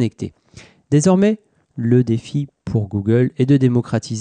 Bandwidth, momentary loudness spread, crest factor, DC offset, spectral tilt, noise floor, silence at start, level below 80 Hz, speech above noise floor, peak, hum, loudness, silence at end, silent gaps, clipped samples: 9.8 kHz; 12 LU; 14 dB; under 0.1%; -7.5 dB/octave; -42 dBFS; 0 s; -52 dBFS; 25 dB; -4 dBFS; none; -18 LUFS; 0 s; none; under 0.1%